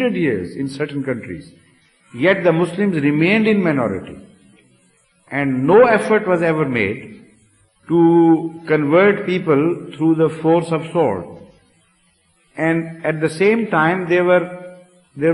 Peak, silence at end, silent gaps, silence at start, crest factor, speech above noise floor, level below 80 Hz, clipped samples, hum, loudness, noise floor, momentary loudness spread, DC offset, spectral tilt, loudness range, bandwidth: -2 dBFS; 0 s; none; 0 s; 14 dB; 43 dB; -58 dBFS; under 0.1%; none; -17 LUFS; -59 dBFS; 13 LU; under 0.1%; -7.5 dB/octave; 4 LU; 11.5 kHz